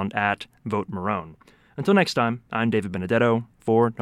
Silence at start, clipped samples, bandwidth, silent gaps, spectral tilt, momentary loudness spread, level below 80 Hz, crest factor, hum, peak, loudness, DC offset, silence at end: 0 s; under 0.1%; 12.5 kHz; none; -6.5 dB/octave; 9 LU; -60 dBFS; 18 dB; none; -6 dBFS; -24 LUFS; under 0.1%; 0 s